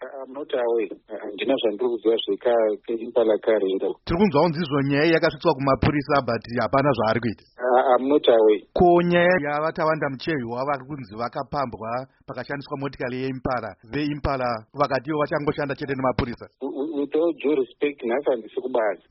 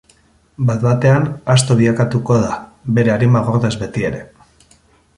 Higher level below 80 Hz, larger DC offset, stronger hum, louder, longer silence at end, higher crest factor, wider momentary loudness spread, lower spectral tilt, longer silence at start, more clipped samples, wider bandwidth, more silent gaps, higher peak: about the same, -46 dBFS vs -44 dBFS; neither; neither; second, -23 LUFS vs -15 LUFS; second, 0.15 s vs 0.9 s; about the same, 16 dB vs 16 dB; first, 12 LU vs 9 LU; second, -5 dB/octave vs -6.5 dB/octave; second, 0 s vs 0.6 s; neither; second, 6 kHz vs 11.5 kHz; neither; second, -6 dBFS vs 0 dBFS